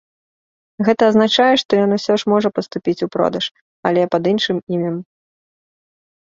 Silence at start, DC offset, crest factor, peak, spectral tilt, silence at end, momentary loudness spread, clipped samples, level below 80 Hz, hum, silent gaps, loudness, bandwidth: 0.8 s; under 0.1%; 16 dB; -2 dBFS; -5.5 dB/octave; 1.25 s; 10 LU; under 0.1%; -60 dBFS; none; 1.65-1.69 s, 3.61-3.83 s, 4.63-4.67 s; -17 LUFS; 7.6 kHz